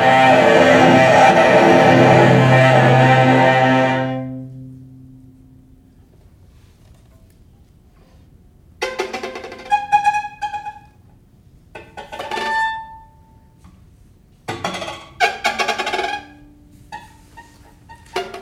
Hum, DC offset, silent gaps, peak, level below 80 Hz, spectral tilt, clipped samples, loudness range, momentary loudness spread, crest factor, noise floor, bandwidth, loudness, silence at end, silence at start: none; under 0.1%; none; 0 dBFS; -50 dBFS; -6 dB/octave; under 0.1%; 17 LU; 22 LU; 16 dB; -49 dBFS; 13 kHz; -14 LUFS; 0 s; 0 s